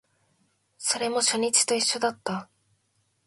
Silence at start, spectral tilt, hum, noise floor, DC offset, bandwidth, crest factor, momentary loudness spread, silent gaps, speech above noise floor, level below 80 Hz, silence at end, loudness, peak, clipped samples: 0.8 s; -1 dB/octave; none; -71 dBFS; under 0.1%; 12 kHz; 24 dB; 12 LU; none; 46 dB; -76 dBFS; 0.8 s; -24 LUFS; -6 dBFS; under 0.1%